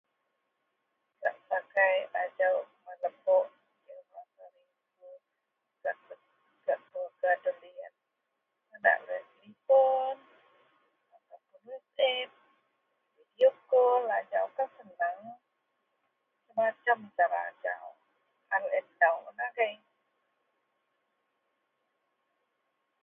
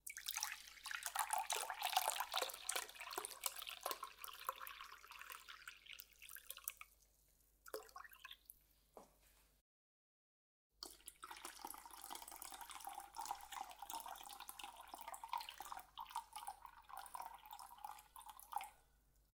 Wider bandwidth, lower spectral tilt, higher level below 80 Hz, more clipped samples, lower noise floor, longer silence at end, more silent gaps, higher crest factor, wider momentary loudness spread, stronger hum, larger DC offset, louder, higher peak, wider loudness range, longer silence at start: second, 3.8 kHz vs 18 kHz; first, -4.5 dB/octave vs 1 dB/octave; second, under -90 dBFS vs -78 dBFS; neither; first, -83 dBFS vs -75 dBFS; first, 3.3 s vs 0.15 s; second, none vs 9.61-10.70 s; second, 22 dB vs 32 dB; first, 19 LU vs 15 LU; neither; neither; first, -30 LUFS vs -48 LUFS; first, -10 dBFS vs -20 dBFS; second, 7 LU vs 17 LU; first, 1.2 s vs 0.05 s